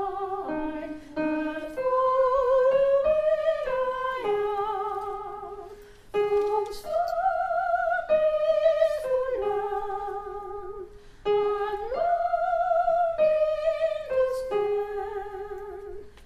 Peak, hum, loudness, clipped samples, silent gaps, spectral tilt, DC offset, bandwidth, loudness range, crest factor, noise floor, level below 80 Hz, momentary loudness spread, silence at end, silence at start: -12 dBFS; none; -26 LUFS; under 0.1%; none; -5.5 dB/octave; under 0.1%; 13.5 kHz; 5 LU; 14 dB; -46 dBFS; -52 dBFS; 14 LU; 0 s; 0 s